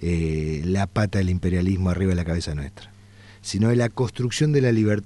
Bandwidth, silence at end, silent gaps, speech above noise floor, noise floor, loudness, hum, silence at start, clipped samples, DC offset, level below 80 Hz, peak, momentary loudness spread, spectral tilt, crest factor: 11.5 kHz; 0 s; none; 26 dB; -47 dBFS; -23 LUFS; none; 0 s; under 0.1%; under 0.1%; -38 dBFS; -8 dBFS; 10 LU; -6.5 dB/octave; 14 dB